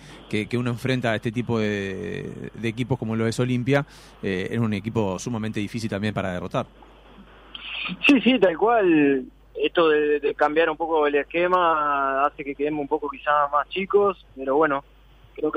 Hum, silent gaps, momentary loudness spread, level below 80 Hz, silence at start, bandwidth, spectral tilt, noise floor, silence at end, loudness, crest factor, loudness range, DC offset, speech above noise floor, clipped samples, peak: none; none; 11 LU; -52 dBFS; 0 s; 13.5 kHz; -6 dB/octave; -48 dBFS; 0 s; -23 LUFS; 18 dB; 7 LU; under 0.1%; 25 dB; under 0.1%; -6 dBFS